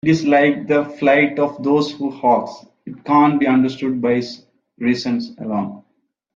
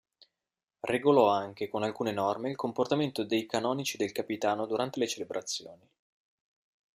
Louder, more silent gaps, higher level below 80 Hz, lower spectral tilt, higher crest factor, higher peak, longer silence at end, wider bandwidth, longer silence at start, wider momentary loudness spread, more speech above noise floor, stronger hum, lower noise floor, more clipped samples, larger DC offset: first, -17 LUFS vs -30 LUFS; neither; first, -60 dBFS vs -74 dBFS; first, -6.5 dB/octave vs -4.5 dB/octave; second, 16 dB vs 22 dB; first, -2 dBFS vs -10 dBFS; second, 0.55 s vs 1.2 s; second, 7.4 kHz vs 15 kHz; second, 0.05 s vs 0.85 s; first, 16 LU vs 10 LU; second, 51 dB vs over 60 dB; neither; second, -68 dBFS vs under -90 dBFS; neither; neither